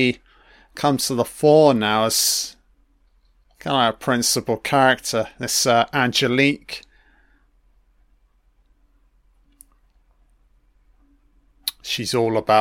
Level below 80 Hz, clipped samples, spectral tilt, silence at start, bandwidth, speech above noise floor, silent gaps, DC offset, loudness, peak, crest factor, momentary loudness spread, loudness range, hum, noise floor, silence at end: -56 dBFS; under 0.1%; -3.5 dB/octave; 0 s; 16.5 kHz; 41 dB; none; under 0.1%; -19 LUFS; -2 dBFS; 20 dB; 14 LU; 10 LU; none; -60 dBFS; 0 s